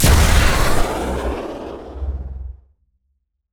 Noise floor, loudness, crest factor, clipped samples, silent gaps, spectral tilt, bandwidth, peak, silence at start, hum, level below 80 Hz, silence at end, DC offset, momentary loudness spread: -69 dBFS; -19 LUFS; 16 dB; under 0.1%; none; -4.5 dB/octave; over 20 kHz; -2 dBFS; 0 s; none; -20 dBFS; 1 s; under 0.1%; 18 LU